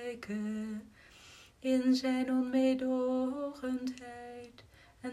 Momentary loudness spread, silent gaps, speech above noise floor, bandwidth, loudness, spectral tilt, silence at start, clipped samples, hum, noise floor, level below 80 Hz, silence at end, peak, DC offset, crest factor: 20 LU; none; 24 dB; 12.5 kHz; -33 LUFS; -5.5 dB/octave; 0 s; under 0.1%; none; -57 dBFS; -68 dBFS; 0 s; -20 dBFS; under 0.1%; 14 dB